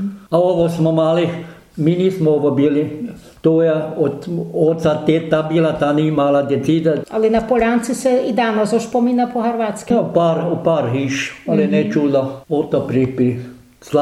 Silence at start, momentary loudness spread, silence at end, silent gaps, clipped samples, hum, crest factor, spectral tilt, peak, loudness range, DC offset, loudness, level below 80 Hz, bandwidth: 0 s; 6 LU; 0 s; none; under 0.1%; none; 16 dB; -7 dB/octave; -2 dBFS; 1 LU; under 0.1%; -17 LUFS; -48 dBFS; 13.5 kHz